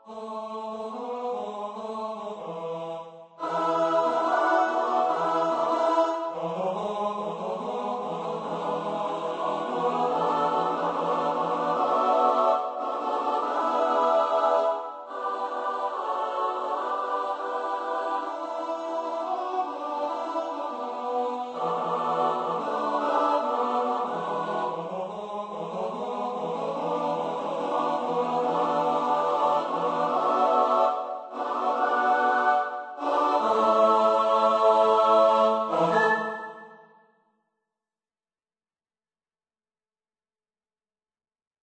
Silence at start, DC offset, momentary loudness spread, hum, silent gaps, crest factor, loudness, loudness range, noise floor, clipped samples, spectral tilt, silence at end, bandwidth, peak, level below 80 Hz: 0.05 s; under 0.1%; 12 LU; none; none; 18 dB; -26 LUFS; 8 LU; under -90 dBFS; under 0.1%; -5 dB/octave; 4.85 s; 8.6 kHz; -8 dBFS; -76 dBFS